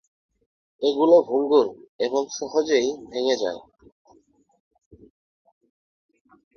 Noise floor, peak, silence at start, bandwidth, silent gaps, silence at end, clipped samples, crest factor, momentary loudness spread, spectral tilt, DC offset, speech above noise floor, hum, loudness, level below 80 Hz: -59 dBFS; -6 dBFS; 0.8 s; 6.8 kHz; 1.89-1.99 s; 2.95 s; under 0.1%; 20 dB; 12 LU; -3.5 dB/octave; under 0.1%; 38 dB; none; -22 LUFS; -66 dBFS